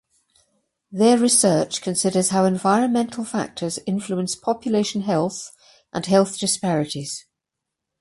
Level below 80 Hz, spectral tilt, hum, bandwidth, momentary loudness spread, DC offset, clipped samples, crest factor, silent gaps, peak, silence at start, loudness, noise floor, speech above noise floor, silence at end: -62 dBFS; -4.5 dB/octave; none; 11.5 kHz; 13 LU; under 0.1%; under 0.1%; 18 dB; none; -4 dBFS; 0.9 s; -21 LUFS; -83 dBFS; 63 dB; 0.8 s